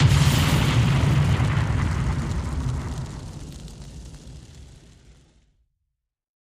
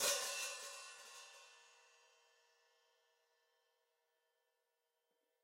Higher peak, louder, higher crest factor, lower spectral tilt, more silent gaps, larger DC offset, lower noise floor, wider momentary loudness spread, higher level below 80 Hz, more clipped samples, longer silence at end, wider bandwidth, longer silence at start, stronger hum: first, -6 dBFS vs -24 dBFS; first, -22 LUFS vs -44 LUFS; second, 18 dB vs 26 dB; first, -5.5 dB/octave vs 2 dB/octave; neither; neither; second, -79 dBFS vs -87 dBFS; about the same, 22 LU vs 24 LU; first, -32 dBFS vs under -90 dBFS; neither; second, 1.8 s vs 3.6 s; about the same, 15.5 kHz vs 16 kHz; about the same, 0 s vs 0 s; neither